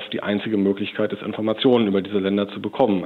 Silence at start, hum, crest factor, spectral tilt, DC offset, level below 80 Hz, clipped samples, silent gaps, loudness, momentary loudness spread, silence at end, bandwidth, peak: 0 s; none; 16 dB; -8.5 dB/octave; under 0.1%; -68 dBFS; under 0.1%; none; -22 LUFS; 7 LU; 0 s; 4.5 kHz; -4 dBFS